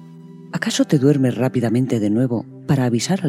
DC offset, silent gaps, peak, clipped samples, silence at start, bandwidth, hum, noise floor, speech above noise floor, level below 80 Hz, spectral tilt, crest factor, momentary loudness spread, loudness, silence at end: under 0.1%; none; -2 dBFS; under 0.1%; 0 s; 15.5 kHz; none; -39 dBFS; 22 dB; -62 dBFS; -6 dB/octave; 16 dB; 8 LU; -19 LUFS; 0 s